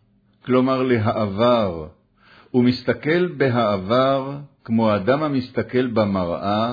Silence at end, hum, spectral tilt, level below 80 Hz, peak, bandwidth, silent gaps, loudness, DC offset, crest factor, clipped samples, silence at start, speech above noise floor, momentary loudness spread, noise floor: 0 s; none; -9 dB/octave; -54 dBFS; -6 dBFS; 5 kHz; none; -20 LUFS; under 0.1%; 14 dB; under 0.1%; 0.45 s; 33 dB; 6 LU; -52 dBFS